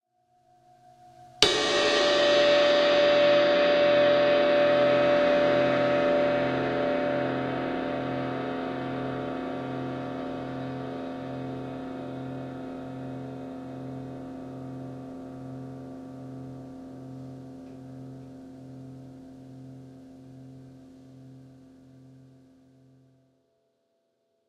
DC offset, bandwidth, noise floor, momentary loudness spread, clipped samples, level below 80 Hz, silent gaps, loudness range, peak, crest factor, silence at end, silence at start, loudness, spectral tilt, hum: under 0.1%; 10.5 kHz; -74 dBFS; 23 LU; under 0.1%; -62 dBFS; none; 23 LU; -2 dBFS; 26 dB; 3 s; 1.2 s; -25 LUFS; -4.5 dB/octave; none